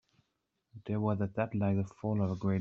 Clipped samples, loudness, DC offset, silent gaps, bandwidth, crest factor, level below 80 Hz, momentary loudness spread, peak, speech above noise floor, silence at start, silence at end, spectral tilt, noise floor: under 0.1%; -34 LUFS; under 0.1%; none; 7 kHz; 16 dB; -68 dBFS; 4 LU; -18 dBFS; 50 dB; 0.75 s; 0 s; -9.5 dB/octave; -82 dBFS